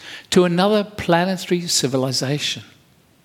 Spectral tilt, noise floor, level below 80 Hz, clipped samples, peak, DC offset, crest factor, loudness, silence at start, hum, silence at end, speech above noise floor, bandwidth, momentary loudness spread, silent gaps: -4 dB/octave; -54 dBFS; -54 dBFS; under 0.1%; 0 dBFS; under 0.1%; 20 dB; -19 LUFS; 0 s; none; 0.6 s; 36 dB; 16.5 kHz; 6 LU; none